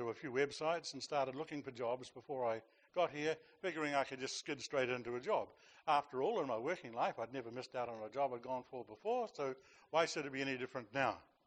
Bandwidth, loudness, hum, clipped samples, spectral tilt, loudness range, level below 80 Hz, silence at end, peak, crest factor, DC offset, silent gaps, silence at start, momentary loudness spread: 9 kHz; -41 LUFS; none; under 0.1%; -4 dB/octave; 2 LU; -82 dBFS; 0.25 s; -20 dBFS; 20 dB; under 0.1%; none; 0 s; 8 LU